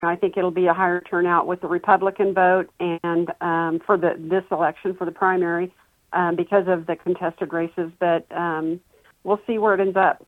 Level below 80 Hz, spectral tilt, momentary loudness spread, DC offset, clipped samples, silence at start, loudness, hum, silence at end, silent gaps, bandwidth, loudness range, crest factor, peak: -66 dBFS; -8.5 dB/octave; 8 LU; under 0.1%; under 0.1%; 0 s; -22 LUFS; none; 0.1 s; none; 4.1 kHz; 3 LU; 20 dB; -2 dBFS